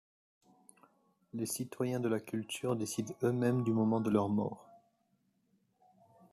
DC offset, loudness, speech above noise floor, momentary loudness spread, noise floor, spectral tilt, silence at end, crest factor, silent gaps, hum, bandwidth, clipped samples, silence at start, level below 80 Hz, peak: under 0.1%; -34 LUFS; 43 dB; 9 LU; -76 dBFS; -6 dB/octave; 1.55 s; 20 dB; none; none; 14 kHz; under 0.1%; 1.35 s; -76 dBFS; -18 dBFS